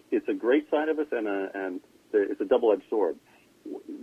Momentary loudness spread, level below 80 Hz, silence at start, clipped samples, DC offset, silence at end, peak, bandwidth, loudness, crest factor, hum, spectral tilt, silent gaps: 17 LU; -74 dBFS; 0.1 s; under 0.1%; under 0.1%; 0 s; -10 dBFS; 7.6 kHz; -27 LUFS; 18 dB; none; -6 dB/octave; none